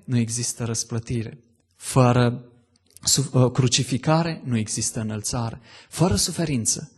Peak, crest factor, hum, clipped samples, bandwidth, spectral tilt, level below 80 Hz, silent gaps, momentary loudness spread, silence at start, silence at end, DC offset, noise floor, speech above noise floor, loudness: -4 dBFS; 20 dB; none; under 0.1%; 12.5 kHz; -4.5 dB/octave; -48 dBFS; none; 11 LU; 0.1 s; 0.1 s; under 0.1%; -55 dBFS; 32 dB; -22 LUFS